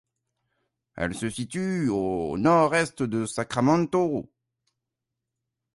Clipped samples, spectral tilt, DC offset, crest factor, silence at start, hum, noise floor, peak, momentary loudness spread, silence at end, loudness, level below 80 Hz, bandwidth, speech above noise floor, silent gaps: under 0.1%; -6 dB/octave; under 0.1%; 20 dB; 0.95 s; none; -85 dBFS; -6 dBFS; 10 LU; 1.55 s; -25 LUFS; -56 dBFS; 11.5 kHz; 60 dB; none